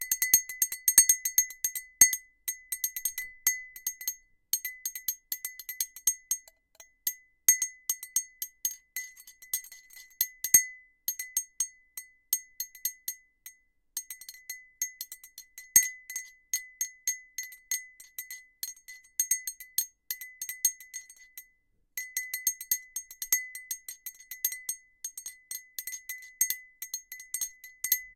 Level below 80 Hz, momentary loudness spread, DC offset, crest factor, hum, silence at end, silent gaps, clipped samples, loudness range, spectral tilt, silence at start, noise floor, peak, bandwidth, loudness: -70 dBFS; 20 LU; under 0.1%; 30 dB; none; 0.05 s; none; under 0.1%; 8 LU; 3 dB/octave; 0 s; -70 dBFS; -4 dBFS; 17 kHz; -29 LUFS